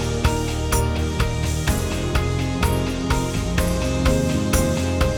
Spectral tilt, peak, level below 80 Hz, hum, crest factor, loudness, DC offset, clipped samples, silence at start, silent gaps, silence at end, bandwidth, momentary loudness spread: -5 dB/octave; -4 dBFS; -26 dBFS; none; 16 dB; -22 LUFS; under 0.1%; under 0.1%; 0 s; none; 0 s; 19 kHz; 3 LU